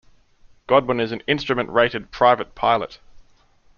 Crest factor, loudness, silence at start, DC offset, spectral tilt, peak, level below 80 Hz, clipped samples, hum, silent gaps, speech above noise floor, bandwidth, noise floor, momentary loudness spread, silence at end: 20 dB; -20 LUFS; 0.7 s; under 0.1%; -2.5 dB/octave; -2 dBFS; -50 dBFS; under 0.1%; none; none; 35 dB; 7 kHz; -55 dBFS; 6 LU; 0.6 s